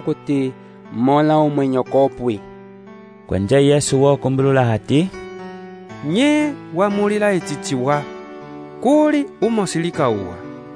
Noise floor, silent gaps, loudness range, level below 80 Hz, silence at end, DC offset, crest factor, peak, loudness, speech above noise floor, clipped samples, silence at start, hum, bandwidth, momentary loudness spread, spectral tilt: -40 dBFS; none; 2 LU; -52 dBFS; 0 s; under 0.1%; 16 dB; -2 dBFS; -18 LUFS; 23 dB; under 0.1%; 0 s; none; 11 kHz; 18 LU; -6 dB/octave